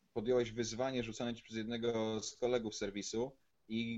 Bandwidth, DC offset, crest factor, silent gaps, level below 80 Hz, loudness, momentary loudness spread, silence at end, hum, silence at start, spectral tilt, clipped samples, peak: 8.2 kHz; under 0.1%; 16 dB; none; -64 dBFS; -39 LUFS; 7 LU; 0 s; none; 0.15 s; -4.5 dB/octave; under 0.1%; -22 dBFS